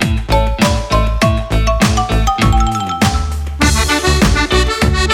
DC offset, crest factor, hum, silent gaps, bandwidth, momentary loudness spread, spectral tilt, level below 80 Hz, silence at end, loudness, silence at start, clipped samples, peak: under 0.1%; 12 dB; none; none; 16.5 kHz; 4 LU; -4.5 dB/octave; -16 dBFS; 0 s; -14 LUFS; 0 s; under 0.1%; 0 dBFS